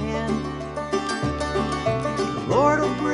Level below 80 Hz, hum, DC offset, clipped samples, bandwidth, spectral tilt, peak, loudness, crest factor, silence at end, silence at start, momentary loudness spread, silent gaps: -40 dBFS; none; under 0.1%; under 0.1%; 11.5 kHz; -5.5 dB/octave; -6 dBFS; -24 LUFS; 16 dB; 0 s; 0 s; 8 LU; none